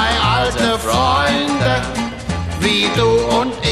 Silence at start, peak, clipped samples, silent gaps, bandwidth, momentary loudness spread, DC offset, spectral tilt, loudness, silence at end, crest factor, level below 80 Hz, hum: 0 s; -2 dBFS; under 0.1%; none; 14 kHz; 8 LU; 0.3%; -4.5 dB/octave; -16 LUFS; 0 s; 14 dB; -32 dBFS; none